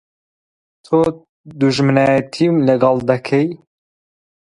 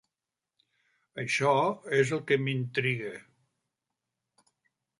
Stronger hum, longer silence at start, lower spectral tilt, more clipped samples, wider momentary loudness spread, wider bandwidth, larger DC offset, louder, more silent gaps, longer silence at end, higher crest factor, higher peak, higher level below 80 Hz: neither; second, 0.9 s vs 1.15 s; first, -7 dB/octave vs -5.5 dB/octave; neither; second, 6 LU vs 14 LU; about the same, 11 kHz vs 11.5 kHz; neither; first, -16 LUFS vs -28 LUFS; first, 1.29-1.44 s vs none; second, 1.05 s vs 1.8 s; about the same, 16 dB vs 20 dB; first, 0 dBFS vs -12 dBFS; first, -54 dBFS vs -74 dBFS